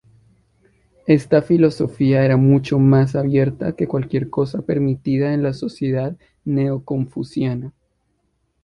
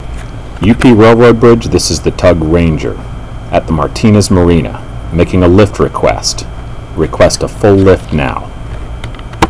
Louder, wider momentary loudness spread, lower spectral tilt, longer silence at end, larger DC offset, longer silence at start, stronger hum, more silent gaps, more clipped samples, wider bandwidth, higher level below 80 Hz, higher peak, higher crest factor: second, -19 LUFS vs -9 LUFS; second, 10 LU vs 20 LU; first, -9 dB/octave vs -6 dB/octave; first, 0.95 s vs 0 s; second, under 0.1% vs 3%; first, 1.05 s vs 0 s; neither; neither; second, under 0.1% vs 2%; about the same, 10.5 kHz vs 11 kHz; second, -50 dBFS vs -22 dBFS; about the same, -2 dBFS vs 0 dBFS; first, 16 dB vs 10 dB